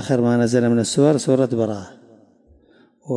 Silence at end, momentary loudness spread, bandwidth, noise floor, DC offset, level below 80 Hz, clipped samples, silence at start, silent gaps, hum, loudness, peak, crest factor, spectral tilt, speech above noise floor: 0 s; 7 LU; 11.5 kHz; -54 dBFS; under 0.1%; -62 dBFS; under 0.1%; 0 s; none; none; -18 LUFS; -4 dBFS; 16 dB; -6 dB/octave; 37 dB